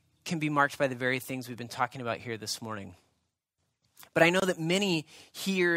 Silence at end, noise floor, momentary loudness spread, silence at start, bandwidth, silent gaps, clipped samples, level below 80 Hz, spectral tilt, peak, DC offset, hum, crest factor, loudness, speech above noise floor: 0 s; -81 dBFS; 15 LU; 0.25 s; 16 kHz; none; under 0.1%; -72 dBFS; -4.5 dB/octave; -8 dBFS; under 0.1%; none; 24 dB; -30 LUFS; 51 dB